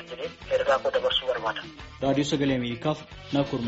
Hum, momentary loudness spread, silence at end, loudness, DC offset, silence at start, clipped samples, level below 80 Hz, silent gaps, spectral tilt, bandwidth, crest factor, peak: none; 12 LU; 0 s; -27 LUFS; under 0.1%; 0 s; under 0.1%; -52 dBFS; none; -3.5 dB/octave; 8 kHz; 16 dB; -10 dBFS